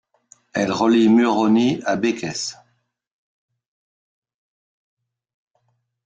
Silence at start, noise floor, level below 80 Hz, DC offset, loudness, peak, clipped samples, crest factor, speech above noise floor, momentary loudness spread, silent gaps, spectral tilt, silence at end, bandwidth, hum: 0.55 s; -69 dBFS; -64 dBFS; under 0.1%; -19 LUFS; -6 dBFS; under 0.1%; 16 dB; 51 dB; 13 LU; none; -5 dB/octave; 3.5 s; 9 kHz; none